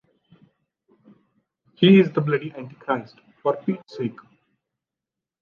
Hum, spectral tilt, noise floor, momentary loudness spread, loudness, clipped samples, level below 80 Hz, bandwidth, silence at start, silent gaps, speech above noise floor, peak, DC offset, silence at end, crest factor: none; -9 dB/octave; -87 dBFS; 16 LU; -21 LUFS; under 0.1%; -74 dBFS; 5.4 kHz; 1.8 s; none; 67 dB; -4 dBFS; under 0.1%; 1.3 s; 20 dB